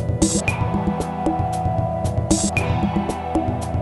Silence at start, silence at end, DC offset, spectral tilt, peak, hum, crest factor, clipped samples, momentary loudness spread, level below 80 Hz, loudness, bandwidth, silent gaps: 0 s; 0 s; under 0.1%; -5.5 dB/octave; -2 dBFS; none; 18 dB; under 0.1%; 4 LU; -32 dBFS; -21 LUFS; 12 kHz; none